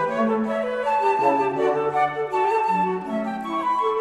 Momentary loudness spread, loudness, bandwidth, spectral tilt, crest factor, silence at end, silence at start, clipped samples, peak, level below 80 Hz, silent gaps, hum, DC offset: 6 LU; -22 LUFS; 12 kHz; -6.5 dB/octave; 14 dB; 0 s; 0 s; under 0.1%; -8 dBFS; -62 dBFS; none; none; under 0.1%